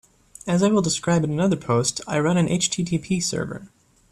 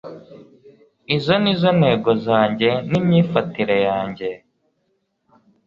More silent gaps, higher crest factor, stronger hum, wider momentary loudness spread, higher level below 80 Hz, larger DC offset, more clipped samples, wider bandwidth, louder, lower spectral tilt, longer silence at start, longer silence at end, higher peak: neither; about the same, 14 dB vs 18 dB; neither; second, 8 LU vs 12 LU; about the same, -54 dBFS vs -56 dBFS; neither; neither; first, 13 kHz vs 7 kHz; second, -22 LUFS vs -18 LUFS; second, -5 dB/octave vs -8 dB/octave; first, 0.45 s vs 0.05 s; second, 0.45 s vs 1.3 s; second, -8 dBFS vs -2 dBFS